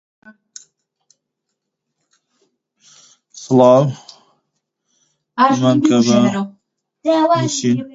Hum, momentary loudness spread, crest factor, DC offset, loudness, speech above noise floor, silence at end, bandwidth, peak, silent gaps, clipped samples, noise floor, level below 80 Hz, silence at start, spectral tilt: none; 17 LU; 18 dB; under 0.1%; -14 LUFS; 63 dB; 0.05 s; 8 kHz; 0 dBFS; none; under 0.1%; -77 dBFS; -64 dBFS; 3.35 s; -5.5 dB/octave